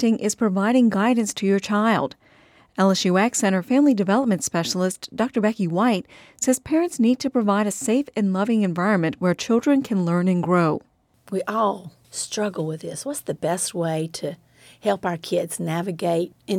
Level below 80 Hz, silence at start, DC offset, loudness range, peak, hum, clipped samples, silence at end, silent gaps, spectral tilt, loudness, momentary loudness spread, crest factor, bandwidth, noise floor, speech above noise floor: -64 dBFS; 0 s; under 0.1%; 6 LU; -6 dBFS; none; under 0.1%; 0 s; none; -5 dB/octave; -22 LUFS; 10 LU; 14 dB; 16 kHz; -54 dBFS; 33 dB